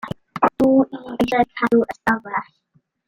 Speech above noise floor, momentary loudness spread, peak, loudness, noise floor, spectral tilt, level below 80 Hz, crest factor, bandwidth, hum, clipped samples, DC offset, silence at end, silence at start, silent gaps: 43 dB; 10 LU; -2 dBFS; -19 LUFS; -63 dBFS; -6.5 dB/octave; -52 dBFS; 18 dB; 15 kHz; none; under 0.1%; under 0.1%; 0.65 s; 0.05 s; none